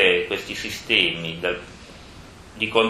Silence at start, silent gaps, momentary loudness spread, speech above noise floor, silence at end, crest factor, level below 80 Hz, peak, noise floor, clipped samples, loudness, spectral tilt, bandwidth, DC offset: 0 s; none; 25 LU; 20 dB; 0 s; 22 dB; -50 dBFS; -2 dBFS; -43 dBFS; under 0.1%; -22 LUFS; -3.5 dB/octave; 15 kHz; under 0.1%